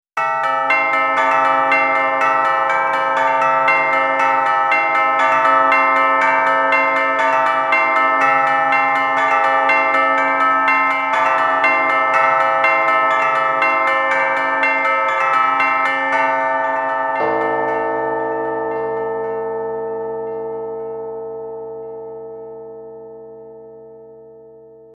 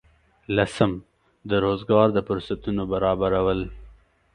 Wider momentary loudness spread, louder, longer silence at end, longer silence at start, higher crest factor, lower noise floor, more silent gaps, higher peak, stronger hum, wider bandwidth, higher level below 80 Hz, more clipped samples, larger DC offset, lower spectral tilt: first, 13 LU vs 10 LU; first, -15 LUFS vs -23 LUFS; about the same, 0.45 s vs 0.45 s; second, 0.15 s vs 0.5 s; second, 16 dB vs 22 dB; second, -42 dBFS vs -51 dBFS; neither; about the same, -2 dBFS vs -2 dBFS; neither; about the same, 11.5 kHz vs 10.5 kHz; second, -64 dBFS vs -44 dBFS; neither; neither; second, -4 dB/octave vs -7 dB/octave